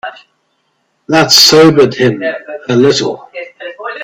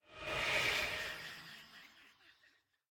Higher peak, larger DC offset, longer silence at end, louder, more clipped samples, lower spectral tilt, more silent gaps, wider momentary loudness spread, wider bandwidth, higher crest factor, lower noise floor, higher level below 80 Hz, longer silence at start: first, 0 dBFS vs -22 dBFS; neither; second, 0 s vs 0.6 s; first, -8 LUFS vs -37 LUFS; first, 0.4% vs under 0.1%; first, -3.5 dB/octave vs -1.5 dB/octave; neither; about the same, 21 LU vs 22 LU; first, over 20 kHz vs 17.5 kHz; second, 12 dB vs 20 dB; second, -61 dBFS vs -73 dBFS; first, -52 dBFS vs -64 dBFS; about the same, 0.05 s vs 0.1 s